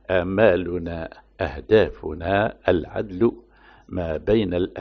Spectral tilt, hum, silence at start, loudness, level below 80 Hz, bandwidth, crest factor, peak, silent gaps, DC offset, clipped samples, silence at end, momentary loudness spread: -5.5 dB/octave; none; 0.1 s; -22 LUFS; -42 dBFS; 6.2 kHz; 18 dB; -4 dBFS; none; under 0.1%; under 0.1%; 0 s; 12 LU